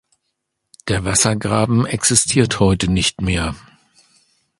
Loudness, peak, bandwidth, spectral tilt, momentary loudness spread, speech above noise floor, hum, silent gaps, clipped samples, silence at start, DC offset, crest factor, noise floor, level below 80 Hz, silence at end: -16 LUFS; 0 dBFS; 11.5 kHz; -4 dB/octave; 9 LU; 58 dB; none; none; under 0.1%; 0.85 s; under 0.1%; 18 dB; -74 dBFS; -36 dBFS; 1 s